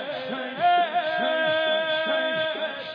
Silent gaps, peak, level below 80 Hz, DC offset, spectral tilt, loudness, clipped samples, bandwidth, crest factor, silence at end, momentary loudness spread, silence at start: none; -12 dBFS; -78 dBFS; under 0.1%; -5.5 dB/octave; -24 LUFS; under 0.1%; 5.2 kHz; 14 dB; 0 s; 8 LU; 0 s